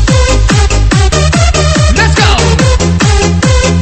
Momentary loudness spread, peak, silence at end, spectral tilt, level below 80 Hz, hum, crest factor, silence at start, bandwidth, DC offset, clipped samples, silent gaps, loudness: 2 LU; 0 dBFS; 0 s; -4.5 dB/octave; -12 dBFS; none; 6 dB; 0 s; 8.8 kHz; under 0.1%; 0.3%; none; -8 LUFS